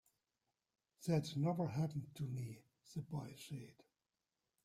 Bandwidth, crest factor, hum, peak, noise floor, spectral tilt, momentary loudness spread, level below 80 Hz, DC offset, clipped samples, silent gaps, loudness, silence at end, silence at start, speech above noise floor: 15 kHz; 20 dB; none; -26 dBFS; under -90 dBFS; -7 dB/octave; 13 LU; -76 dBFS; under 0.1%; under 0.1%; none; -43 LUFS; 0.9 s; 1 s; over 48 dB